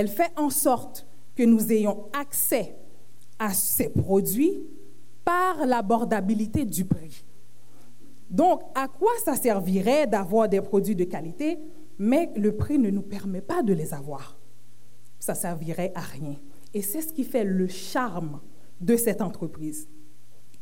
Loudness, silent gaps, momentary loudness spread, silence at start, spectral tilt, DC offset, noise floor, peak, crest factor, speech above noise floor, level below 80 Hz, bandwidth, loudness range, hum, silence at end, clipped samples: -25 LUFS; none; 14 LU; 0 s; -5.5 dB/octave; 2%; -57 dBFS; -8 dBFS; 18 dB; 32 dB; -56 dBFS; 17 kHz; 6 LU; none; 0.75 s; under 0.1%